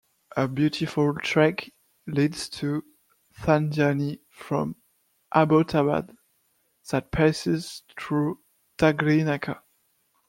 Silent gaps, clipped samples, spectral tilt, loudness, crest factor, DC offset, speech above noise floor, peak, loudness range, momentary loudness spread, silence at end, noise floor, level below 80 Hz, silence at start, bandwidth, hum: none; under 0.1%; -6.5 dB/octave; -25 LUFS; 20 dB; under 0.1%; 46 dB; -4 dBFS; 2 LU; 16 LU; 0.7 s; -69 dBFS; -54 dBFS; 0.35 s; 16 kHz; none